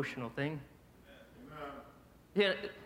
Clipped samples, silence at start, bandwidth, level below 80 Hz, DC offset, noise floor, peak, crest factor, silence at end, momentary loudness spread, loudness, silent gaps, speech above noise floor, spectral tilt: under 0.1%; 0 s; 16.5 kHz; -66 dBFS; under 0.1%; -60 dBFS; -18 dBFS; 22 dB; 0 s; 26 LU; -37 LUFS; none; 24 dB; -6 dB/octave